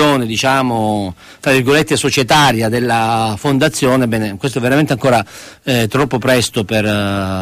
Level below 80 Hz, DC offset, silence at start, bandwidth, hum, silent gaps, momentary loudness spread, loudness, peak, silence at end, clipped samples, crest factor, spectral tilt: -44 dBFS; under 0.1%; 0 s; 15.5 kHz; none; none; 6 LU; -14 LUFS; 0 dBFS; 0 s; under 0.1%; 14 dB; -4.5 dB/octave